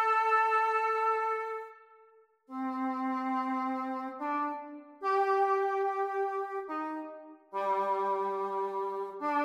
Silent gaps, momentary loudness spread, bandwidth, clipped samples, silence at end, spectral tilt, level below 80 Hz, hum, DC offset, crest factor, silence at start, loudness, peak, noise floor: none; 13 LU; 11 kHz; under 0.1%; 0 s; -5 dB/octave; -88 dBFS; none; under 0.1%; 16 dB; 0 s; -32 LUFS; -16 dBFS; -62 dBFS